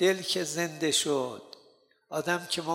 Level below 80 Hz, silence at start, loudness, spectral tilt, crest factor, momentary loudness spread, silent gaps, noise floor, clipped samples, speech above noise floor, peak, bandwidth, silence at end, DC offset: -78 dBFS; 0 s; -29 LUFS; -2.5 dB/octave; 18 dB; 11 LU; none; -63 dBFS; under 0.1%; 34 dB; -12 dBFS; 16.5 kHz; 0 s; under 0.1%